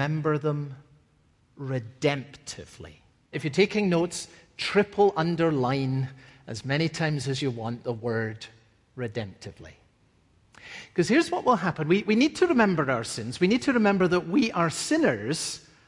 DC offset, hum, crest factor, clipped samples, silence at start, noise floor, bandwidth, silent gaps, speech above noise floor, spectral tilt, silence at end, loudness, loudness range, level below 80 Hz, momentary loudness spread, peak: under 0.1%; none; 18 dB; under 0.1%; 0 s; -64 dBFS; 11.5 kHz; none; 38 dB; -5.5 dB/octave; 0.3 s; -26 LUFS; 9 LU; -62 dBFS; 17 LU; -8 dBFS